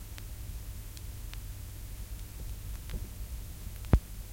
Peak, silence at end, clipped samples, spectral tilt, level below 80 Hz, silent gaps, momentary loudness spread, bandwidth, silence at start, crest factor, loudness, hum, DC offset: -8 dBFS; 0 s; under 0.1%; -6 dB/octave; -40 dBFS; none; 14 LU; 17 kHz; 0 s; 30 dB; -39 LUFS; none; under 0.1%